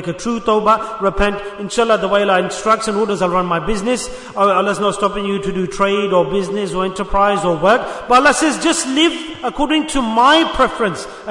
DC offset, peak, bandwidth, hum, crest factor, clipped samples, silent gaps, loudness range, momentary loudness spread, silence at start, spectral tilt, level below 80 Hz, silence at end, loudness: under 0.1%; 0 dBFS; 11 kHz; none; 16 dB; under 0.1%; none; 3 LU; 8 LU; 0 s; -4 dB/octave; -36 dBFS; 0 s; -16 LUFS